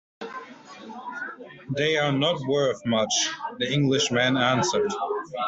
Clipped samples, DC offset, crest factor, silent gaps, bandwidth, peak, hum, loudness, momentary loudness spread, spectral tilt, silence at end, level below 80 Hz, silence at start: under 0.1%; under 0.1%; 18 dB; none; 8.2 kHz; -8 dBFS; none; -24 LUFS; 17 LU; -4 dB/octave; 0 s; -64 dBFS; 0.2 s